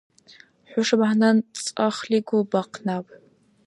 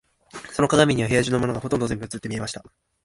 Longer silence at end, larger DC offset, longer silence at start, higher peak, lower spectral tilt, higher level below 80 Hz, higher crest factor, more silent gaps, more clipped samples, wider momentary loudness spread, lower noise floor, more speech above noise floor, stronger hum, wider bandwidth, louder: first, 0.65 s vs 0.45 s; neither; first, 0.7 s vs 0.35 s; second, -6 dBFS vs -2 dBFS; about the same, -5 dB/octave vs -5 dB/octave; second, -76 dBFS vs -48 dBFS; about the same, 18 dB vs 22 dB; neither; neither; second, 11 LU vs 17 LU; first, -53 dBFS vs -42 dBFS; first, 31 dB vs 20 dB; neither; about the same, 11.5 kHz vs 11.5 kHz; about the same, -23 LUFS vs -23 LUFS